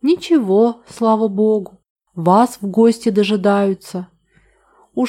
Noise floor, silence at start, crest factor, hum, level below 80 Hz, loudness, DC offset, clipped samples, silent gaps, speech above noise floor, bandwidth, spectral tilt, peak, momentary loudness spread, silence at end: -56 dBFS; 0.05 s; 14 dB; none; -62 dBFS; -16 LUFS; under 0.1%; under 0.1%; 1.90-1.96 s; 41 dB; 14.5 kHz; -6.5 dB/octave; -2 dBFS; 15 LU; 0 s